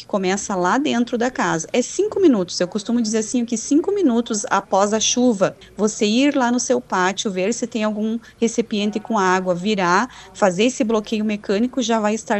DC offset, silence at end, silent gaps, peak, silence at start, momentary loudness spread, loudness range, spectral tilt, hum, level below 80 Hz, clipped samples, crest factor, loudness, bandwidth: under 0.1%; 0 s; none; -2 dBFS; 0 s; 6 LU; 2 LU; -4 dB/octave; none; -56 dBFS; under 0.1%; 18 dB; -19 LUFS; 8.6 kHz